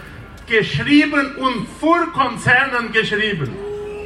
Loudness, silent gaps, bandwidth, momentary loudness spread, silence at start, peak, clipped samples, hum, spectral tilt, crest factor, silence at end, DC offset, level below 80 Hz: -17 LUFS; none; 12 kHz; 13 LU; 0 s; -2 dBFS; under 0.1%; none; -5.5 dB/octave; 16 dB; 0 s; under 0.1%; -44 dBFS